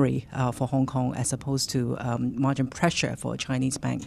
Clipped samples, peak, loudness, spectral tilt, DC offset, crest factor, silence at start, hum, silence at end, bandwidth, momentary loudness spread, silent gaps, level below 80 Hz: under 0.1%; -10 dBFS; -27 LUFS; -5 dB/octave; under 0.1%; 18 dB; 0 s; none; 0 s; 14 kHz; 4 LU; none; -52 dBFS